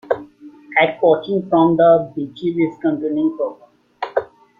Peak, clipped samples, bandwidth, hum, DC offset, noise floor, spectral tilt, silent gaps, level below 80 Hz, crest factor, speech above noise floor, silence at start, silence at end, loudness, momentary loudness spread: -2 dBFS; under 0.1%; 5 kHz; none; under 0.1%; -41 dBFS; -9 dB/octave; none; -60 dBFS; 16 dB; 25 dB; 0.1 s; 0.35 s; -18 LUFS; 12 LU